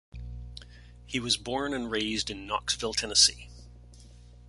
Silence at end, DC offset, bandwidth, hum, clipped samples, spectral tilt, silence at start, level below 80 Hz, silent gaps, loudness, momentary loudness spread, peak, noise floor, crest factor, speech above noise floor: 0 s; under 0.1%; 11.5 kHz; 60 Hz at -50 dBFS; under 0.1%; -1.5 dB/octave; 0.15 s; -48 dBFS; none; -27 LUFS; 24 LU; -8 dBFS; -51 dBFS; 24 dB; 22 dB